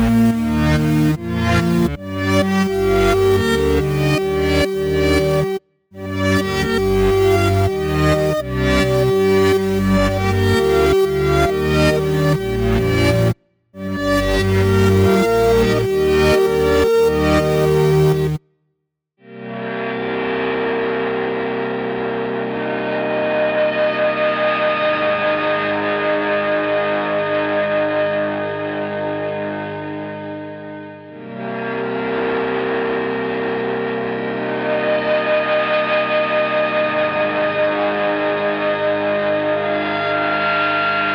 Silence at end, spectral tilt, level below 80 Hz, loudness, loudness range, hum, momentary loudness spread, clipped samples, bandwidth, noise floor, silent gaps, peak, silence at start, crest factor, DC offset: 0 s; -6 dB/octave; -34 dBFS; -17 LUFS; 6 LU; none; 8 LU; under 0.1%; over 20 kHz; -73 dBFS; none; -6 dBFS; 0 s; 12 dB; under 0.1%